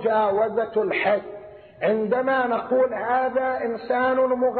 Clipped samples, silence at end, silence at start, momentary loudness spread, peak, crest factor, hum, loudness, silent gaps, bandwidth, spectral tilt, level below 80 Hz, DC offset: under 0.1%; 0 s; 0 s; 6 LU; -8 dBFS; 14 dB; none; -23 LUFS; none; 4.5 kHz; -3.5 dB/octave; -64 dBFS; under 0.1%